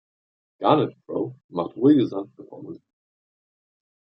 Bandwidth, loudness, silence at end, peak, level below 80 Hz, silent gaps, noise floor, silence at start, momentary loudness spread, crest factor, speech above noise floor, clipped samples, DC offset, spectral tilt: 5.6 kHz; -23 LUFS; 1.35 s; -4 dBFS; -72 dBFS; 1.44-1.49 s; under -90 dBFS; 0.6 s; 21 LU; 22 dB; over 67 dB; under 0.1%; under 0.1%; -9.5 dB/octave